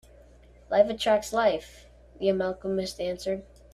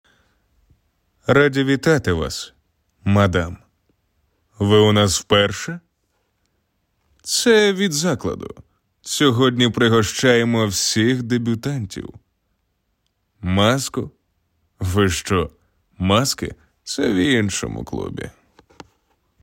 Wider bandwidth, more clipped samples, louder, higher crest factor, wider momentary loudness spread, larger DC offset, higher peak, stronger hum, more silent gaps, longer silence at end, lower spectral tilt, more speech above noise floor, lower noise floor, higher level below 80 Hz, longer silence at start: second, 14 kHz vs 16.5 kHz; neither; second, -27 LUFS vs -18 LUFS; about the same, 20 dB vs 16 dB; second, 10 LU vs 16 LU; neither; second, -8 dBFS vs -4 dBFS; first, 60 Hz at -55 dBFS vs none; neither; second, 0.3 s vs 1.15 s; about the same, -4.5 dB/octave vs -4.5 dB/octave; second, 27 dB vs 52 dB; second, -53 dBFS vs -70 dBFS; second, -54 dBFS vs -48 dBFS; second, 0.7 s vs 1.3 s